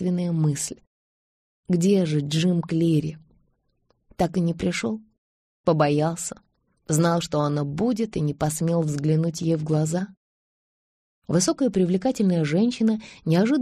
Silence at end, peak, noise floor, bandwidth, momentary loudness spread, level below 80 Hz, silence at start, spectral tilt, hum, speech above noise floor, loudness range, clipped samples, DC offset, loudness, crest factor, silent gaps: 0 s; -8 dBFS; -69 dBFS; 13.5 kHz; 8 LU; -56 dBFS; 0 s; -6 dB/octave; none; 46 dB; 2 LU; under 0.1%; under 0.1%; -23 LUFS; 16 dB; 0.87-1.63 s, 5.18-5.64 s, 10.17-11.22 s